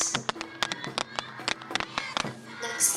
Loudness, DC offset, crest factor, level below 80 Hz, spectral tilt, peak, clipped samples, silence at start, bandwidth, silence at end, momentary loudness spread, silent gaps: -31 LUFS; under 0.1%; 26 dB; -64 dBFS; -1 dB/octave; -6 dBFS; under 0.1%; 0 s; over 20 kHz; 0 s; 6 LU; none